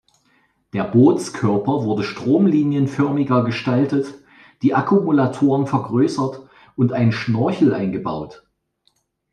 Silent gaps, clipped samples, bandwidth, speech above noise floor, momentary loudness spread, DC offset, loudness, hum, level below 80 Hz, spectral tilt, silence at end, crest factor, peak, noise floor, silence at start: none; under 0.1%; 10.5 kHz; 48 dB; 10 LU; under 0.1%; -19 LUFS; none; -60 dBFS; -7.5 dB/octave; 1 s; 16 dB; -2 dBFS; -65 dBFS; 0.75 s